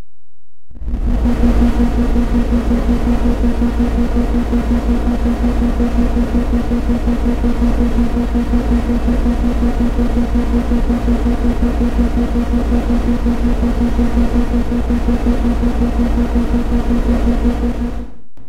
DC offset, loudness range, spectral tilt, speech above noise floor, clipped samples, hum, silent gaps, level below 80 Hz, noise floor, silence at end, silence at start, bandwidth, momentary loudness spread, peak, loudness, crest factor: under 0.1%; 1 LU; -8 dB/octave; 49 dB; under 0.1%; none; none; -16 dBFS; -62 dBFS; 0 s; 0 s; 10.5 kHz; 2 LU; -2 dBFS; -16 LUFS; 12 dB